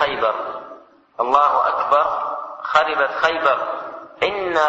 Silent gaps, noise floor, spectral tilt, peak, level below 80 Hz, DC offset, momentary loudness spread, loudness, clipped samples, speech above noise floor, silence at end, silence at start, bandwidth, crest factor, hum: none; -43 dBFS; -3.5 dB/octave; -2 dBFS; -58 dBFS; under 0.1%; 14 LU; -19 LUFS; under 0.1%; 25 dB; 0 s; 0 s; 8 kHz; 16 dB; none